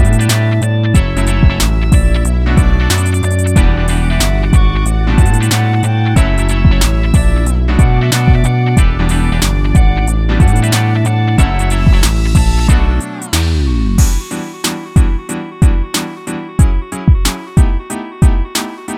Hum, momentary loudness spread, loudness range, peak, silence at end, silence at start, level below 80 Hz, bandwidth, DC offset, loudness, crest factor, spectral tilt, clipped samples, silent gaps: none; 6 LU; 3 LU; 0 dBFS; 0 s; 0 s; -14 dBFS; 16 kHz; under 0.1%; -13 LUFS; 10 dB; -5.5 dB/octave; under 0.1%; none